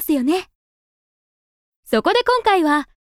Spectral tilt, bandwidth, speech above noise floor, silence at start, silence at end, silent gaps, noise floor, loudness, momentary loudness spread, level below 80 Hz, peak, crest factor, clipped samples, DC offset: -3.5 dB/octave; 16.5 kHz; over 73 dB; 0 s; 0.3 s; 0.55-1.83 s; under -90 dBFS; -18 LUFS; 6 LU; -54 dBFS; -4 dBFS; 16 dB; under 0.1%; under 0.1%